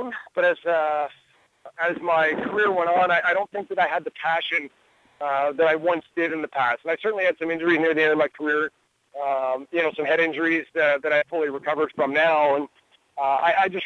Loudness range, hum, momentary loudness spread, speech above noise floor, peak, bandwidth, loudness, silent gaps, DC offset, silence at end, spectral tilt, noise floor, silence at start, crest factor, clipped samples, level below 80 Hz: 2 LU; none; 7 LU; 27 dB; -10 dBFS; 8 kHz; -23 LUFS; none; under 0.1%; 0 s; -5.5 dB/octave; -49 dBFS; 0 s; 14 dB; under 0.1%; -70 dBFS